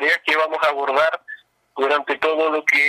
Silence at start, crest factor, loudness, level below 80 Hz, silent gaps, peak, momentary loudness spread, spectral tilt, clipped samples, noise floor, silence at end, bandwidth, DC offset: 0 s; 14 dB; -19 LUFS; -66 dBFS; none; -6 dBFS; 17 LU; -2 dB/octave; under 0.1%; -41 dBFS; 0 s; 15.5 kHz; under 0.1%